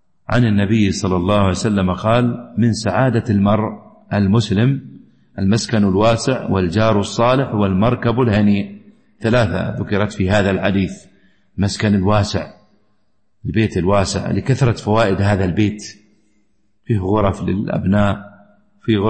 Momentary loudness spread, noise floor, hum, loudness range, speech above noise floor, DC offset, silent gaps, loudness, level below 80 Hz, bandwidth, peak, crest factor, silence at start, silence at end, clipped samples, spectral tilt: 8 LU; -68 dBFS; none; 3 LU; 52 dB; under 0.1%; none; -17 LUFS; -40 dBFS; 8.8 kHz; -2 dBFS; 14 dB; 0.3 s; 0 s; under 0.1%; -6.5 dB/octave